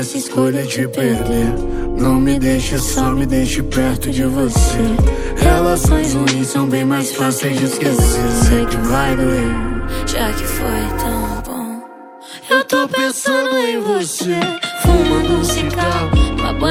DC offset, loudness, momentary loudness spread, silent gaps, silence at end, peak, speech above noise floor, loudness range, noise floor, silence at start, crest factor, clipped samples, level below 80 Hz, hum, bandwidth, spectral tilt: under 0.1%; -16 LUFS; 7 LU; none; 0 s; 0 dBFS; 21 dB; 4 LU; -35 dBFS; 0 s; 16 dB; under 0.1%; -22 dBFS; none; 16.5 kHz; -5 dB/octave